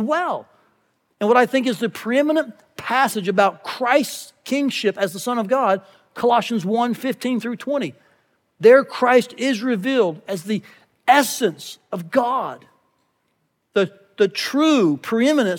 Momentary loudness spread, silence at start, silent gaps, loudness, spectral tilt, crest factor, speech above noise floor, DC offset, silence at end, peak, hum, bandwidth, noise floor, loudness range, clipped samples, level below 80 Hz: 11 LU; 0 s; none; -20 LUFS; -4.5 dB/octave; 18 dB; 50 dB; under 0.1%; 0 s; -2 dBFS; none; 19 kHz; -70 dBFS; 4 LU; under 0.1%; -78 dBFS